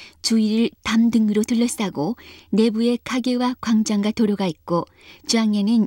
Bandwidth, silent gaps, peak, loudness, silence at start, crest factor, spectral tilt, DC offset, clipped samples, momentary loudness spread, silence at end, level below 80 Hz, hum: 16.5 kHz; none; -6 dBFS; -21 LUFS; 0 s; 14 dB; -5 dB/octave; under 0.1%; under 0.1%; 7 LU; 0 s; -56 dBFS; none